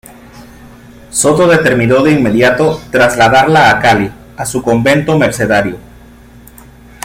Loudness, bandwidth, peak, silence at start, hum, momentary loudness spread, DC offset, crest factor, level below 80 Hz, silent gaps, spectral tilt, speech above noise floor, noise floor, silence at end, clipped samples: -10 LUFS; 17 kHz; 0 dBFS; 0.35 s; none; 11 LU; under 0.1%; 12 dB; -38 dBFS; none; -4.5 dB/octave; 28 dB; -37 dBFS; 1.25 s; under 0.1%